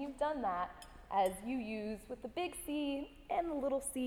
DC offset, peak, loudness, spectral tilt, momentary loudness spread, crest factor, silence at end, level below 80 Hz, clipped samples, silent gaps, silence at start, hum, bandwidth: under 0.1%; -22 dBFS; -39 LUFS; -4 dB/octave; 9 LU; 16 dB; 0 s; -60 dBFS; under 0.1%; none; 0 s; none; over 20 kHz